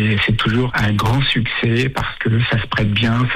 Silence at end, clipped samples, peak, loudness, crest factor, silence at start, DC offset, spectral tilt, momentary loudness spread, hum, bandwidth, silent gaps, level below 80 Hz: 0 s; under 0.1%; -6 dBFS; -17 LUFS; 10 dB; 0 s; under 0.1%; -6.5 dB/octave; 2 LU; none; 14 kHz; none; -34 dBFS